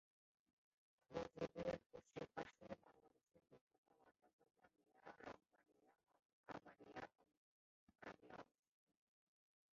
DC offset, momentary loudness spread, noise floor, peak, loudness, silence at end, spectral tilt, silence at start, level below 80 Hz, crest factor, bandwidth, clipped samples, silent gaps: under 0.1%; 13 LU; -74 dBFS; -34 dBFS; -56 LUFS; 1.3 s; -4.5 dB/octave; 1.1 s; -82 dBFS; 26 dB; 7.2 kHz; under 0.1%; 1.86-1.90 s, 3.61-3.67 s, 3.78-3.83 s, 4.33-4.39 s, 6.25-6.44 s, 7.37-7.87 s